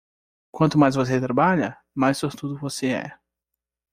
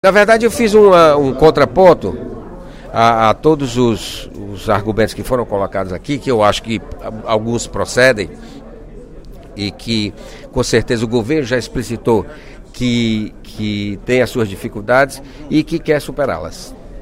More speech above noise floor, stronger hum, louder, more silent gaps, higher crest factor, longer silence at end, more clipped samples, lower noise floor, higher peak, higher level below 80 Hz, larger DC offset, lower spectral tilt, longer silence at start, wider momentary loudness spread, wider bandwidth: first, 63 dB vs 19 dB; neither; second, -22 LUFS vs -14 LUFS; neither; first, 20 dB vs 14 dB; first, 0.8 s vs 0 s; neither; first, -85 dBFS vs -34 dBFS; second, -4 dBFS vs 0 dBFS; second, -56 dBFS vs -34 dBFS; neither; about the same, -6 dB/octave vs -5.5 dB/octave; first, 0.55 s vs 0.05 s; second, 11 LU vs 18 LU; about the same, 15.5 kHz vs 16 kHz